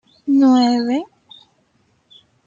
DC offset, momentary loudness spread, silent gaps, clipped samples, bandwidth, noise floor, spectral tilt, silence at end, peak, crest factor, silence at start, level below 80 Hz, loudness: under 0.1%; 11 LU; none; under 0.1%; 7.6 kHz; -61 dBFS; -5 dB/octave; 1.4 s; -4 dBFS; 14 dB; 0.25 s; -70 dBFS; -16 LUFS